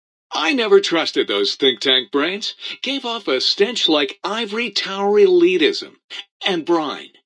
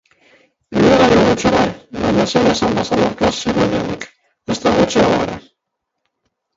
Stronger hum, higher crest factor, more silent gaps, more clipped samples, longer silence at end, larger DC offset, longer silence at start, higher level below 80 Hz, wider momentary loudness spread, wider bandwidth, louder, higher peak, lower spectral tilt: neither; about the same, 16 dB vs 16 dB; first, 6.04-6.09 s, 6.31-6.40 s vs none; neither; second, 0.2 s vs 1.15 s; neither; second, 0.3 s vs 0.7 s; second, -78 dBFS vs -40 dBFS; about the same, 12 LU vs 13 LU; first, 10.5 kHz vs 8 kHz; second, -18 LUFS vs -15 LUFS; about the same, -2 dBFS vs 0 dBFS; second, -3 dB/octave vs -5 dB/octave